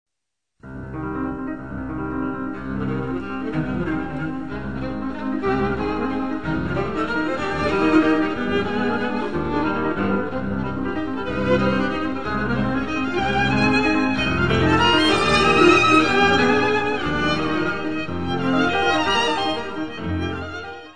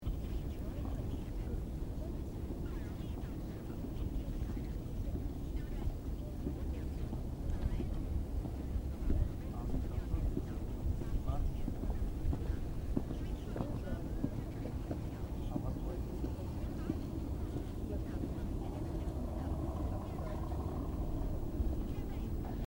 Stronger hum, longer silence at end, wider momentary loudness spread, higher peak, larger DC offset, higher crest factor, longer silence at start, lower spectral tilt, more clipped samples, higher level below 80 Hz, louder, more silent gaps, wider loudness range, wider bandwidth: neither; about the same, 0 s vs 0 s; first, 12 LU vs 4 LU; first, -2 dBFS vs -20 dBFS; first, 2% vs under 0.1%; about the same, 18 dB vs 18 dB; about the same, 0.05 s vs 0 s; second, -5.5 dB/octave vs -8 dB/octave; neither; about the same, -40 dBFS vs -40 dBFS; first, -21 LUFS vs -41 LUFS; neither; first, 10 LU vs 3 LU; second, 10 kHz vs 16.5 kHz